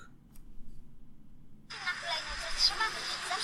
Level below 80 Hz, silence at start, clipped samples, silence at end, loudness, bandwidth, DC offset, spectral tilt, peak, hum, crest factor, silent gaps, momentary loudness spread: -50 dBFS; 0 s; under 0.1%; 0 s; -32 LUFS; 14.5 kHz; under 0.1%; 0 dB/octave; -14 dBFS; none; 22 dB; none; 10 LU